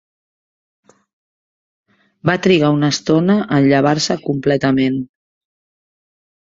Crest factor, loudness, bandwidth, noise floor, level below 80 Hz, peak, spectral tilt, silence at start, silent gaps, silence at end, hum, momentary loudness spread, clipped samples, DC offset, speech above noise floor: 16 dB; -15 LUFS; 7.8 kHz; under -90 dBFS; -54 dBFS; -2 dBFS; -5.5 dB/octave; 2.25 s; none; 1.45 s; none; 6 LU; under 0.1%; under 0.1%; over 76 dB